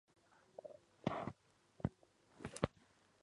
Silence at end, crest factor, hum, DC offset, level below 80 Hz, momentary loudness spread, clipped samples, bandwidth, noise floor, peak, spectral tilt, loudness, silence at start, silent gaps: 0.55 s; 30 dB; none; under 0.1%; -64 dBFS; 15 LU; under 0.1%; 11 kHz; -72 dBFS; -18 dBFS; -6 dB/octave; -47 LUFS; 0.65 s; none